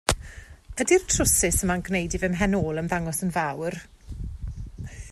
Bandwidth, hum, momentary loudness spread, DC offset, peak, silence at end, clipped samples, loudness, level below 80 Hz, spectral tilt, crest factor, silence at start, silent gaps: 14 kHz; none; 19 LU; under 0.1%; 0 dBFS; 0 s; under 0.1%; -24 LUFS; -38 dBFS; -4 dB/octave; 26 dB; 0.1 s; none